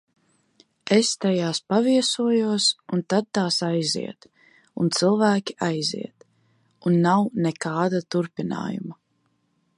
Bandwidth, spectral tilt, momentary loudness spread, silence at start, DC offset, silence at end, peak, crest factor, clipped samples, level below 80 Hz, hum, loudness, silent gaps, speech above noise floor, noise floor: 11.5 kHz; -4.5 dB/octave; 11 LU; 0.85 s; under 0.1%; 0.85 s; -6 dBFS; 18 dB; under 0.1%; -70 dBFS; none; -23 LUFS; none; 47 dB; -69 dBFS